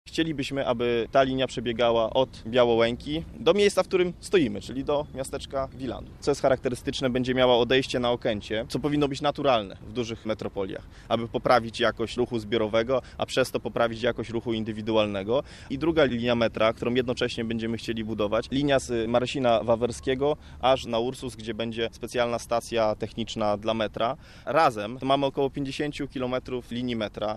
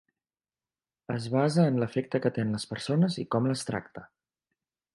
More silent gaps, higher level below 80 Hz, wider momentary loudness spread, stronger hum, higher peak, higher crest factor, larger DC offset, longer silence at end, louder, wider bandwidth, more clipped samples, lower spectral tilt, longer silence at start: neither; first, -48 dBFS vs -66 dBFS; about the same, 9 LU vs 11 LU; neither; first, -6 dBFS vs -10 dBFS; about the same, 20 dB vs 20 dB; neither; second, 0 s vs 0.9 s; first, -26 LUFS vs -29 LUFS; first, 13 kHz vs 11.5 kHz; neither; about the same, -5.5 dB/octave vs -6.5 dB/octave; second, 0.05 s vs 1.1 s